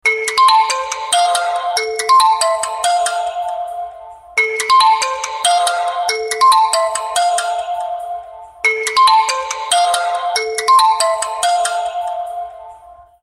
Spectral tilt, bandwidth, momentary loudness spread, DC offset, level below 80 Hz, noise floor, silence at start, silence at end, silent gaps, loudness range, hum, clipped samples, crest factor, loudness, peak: 2.5 dB/octave; 16 kHz; 12 LU; under 0.1%; -58 dBFS; -41 dBFS; 0.05 s; 0.3 s; none; 2 LU; none; under 0.1%; 14 dB; -15 LUFS; -2 dBFS